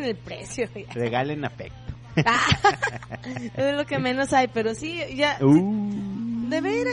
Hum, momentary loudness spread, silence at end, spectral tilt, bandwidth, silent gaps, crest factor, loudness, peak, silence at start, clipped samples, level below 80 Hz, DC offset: none; 15 LU; 0 s; -5.5 dB/octave; 11 kHz; none; 18 dB; -24 LUFS; -6 dBFS; 0 s; under 0.1%; -50 dBFS; under 0.1%